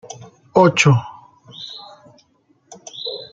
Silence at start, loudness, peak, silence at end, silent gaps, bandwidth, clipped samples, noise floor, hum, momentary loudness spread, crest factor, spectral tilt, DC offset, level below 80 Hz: 0.55 s; -16 LUFS; -2 dBFS; 0.1 s; none; 9.2 kHz; under 0.1%; -60 dBFS; none; 26 LU; 20 dB; -5 dB/octave; under 0.1%; -58 dBFS